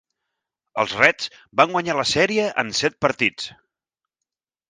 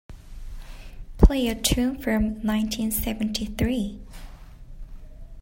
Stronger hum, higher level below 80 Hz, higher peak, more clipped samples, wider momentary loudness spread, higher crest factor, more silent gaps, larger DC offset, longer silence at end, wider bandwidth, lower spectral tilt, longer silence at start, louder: neither; second, -58 dBFS vs -30 dBFS; about the same, 0 dBFS vs -2 dBFS; neither; second, 12 LU vs 24 LU; about the same, 22 dB vs 24 dB; neither; neither; first, 1.2 s vs 0 s; second, 10 kHz vs 16.5 kHz; second, -3 dB/octave vs -5 dB/octave; first, 0.75 s vs 0.1 s; first, -20 LUFS vs -24 LUFS